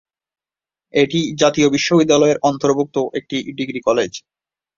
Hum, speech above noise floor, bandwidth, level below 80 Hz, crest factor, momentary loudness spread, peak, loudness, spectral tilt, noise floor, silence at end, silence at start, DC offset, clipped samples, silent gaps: none; over 74 dB; 7.6 kHz; -56 dBFS; 16 dB; 11 LU; -2 dBFS; -17 LUFS; -4.5 dB/octave; under -90 dBFS; 0.6 s; 0.95 s; under 0.1%; under 0.1%; none